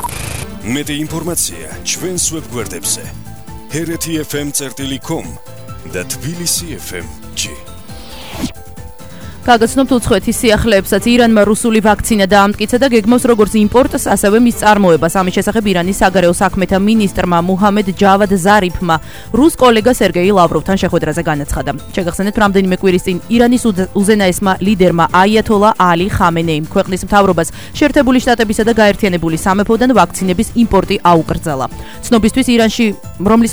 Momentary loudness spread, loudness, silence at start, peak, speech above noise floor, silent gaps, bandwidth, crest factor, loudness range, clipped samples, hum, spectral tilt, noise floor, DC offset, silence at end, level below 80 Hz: 13 LU; -12 LUFS; 0 s; 0 dBFS; 20 dB; none; over 20 kHz; 12 dB; 9 LU; 0.2%; none; -4.5 dB/octave; -32 dBFS; 2%; 0 s; -32 dBFS